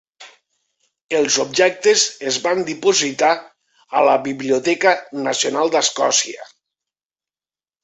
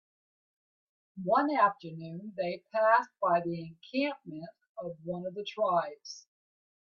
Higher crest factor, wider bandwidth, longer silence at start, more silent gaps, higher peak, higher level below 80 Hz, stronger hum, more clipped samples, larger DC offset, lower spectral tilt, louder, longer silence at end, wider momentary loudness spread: about the same, 18 dB vs 20 dB; first, 8.4 kHz vs 7.2 kHz; second, 0.2 s vs 1.15 s; about the same, 1.04-1.09 s vs 4.69-4.75 s; first, -2 dBFS vs -12 dBFS; first, -68 dBFS vs -78 dBFS; neither; neither; neither; second, -1.5 dB/octave vs -6 dB/octave; first, -17 LUFS vs -31 LUFS; first, 1.4 s vs 0.7 s; second, 7 LU vs 19 LU